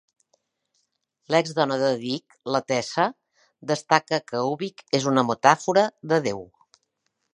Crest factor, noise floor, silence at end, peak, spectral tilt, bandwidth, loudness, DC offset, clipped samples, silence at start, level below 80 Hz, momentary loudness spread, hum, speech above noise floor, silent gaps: 24 dB; -75 dBFS; 0.9 s; 0 dBFS; -4.5 dB/octave; 11 kHz; -23 LUFS; under 0.1%; under 0.1%; 1.3 s; -70 dBFS; 11 LU; none; 52 dB; none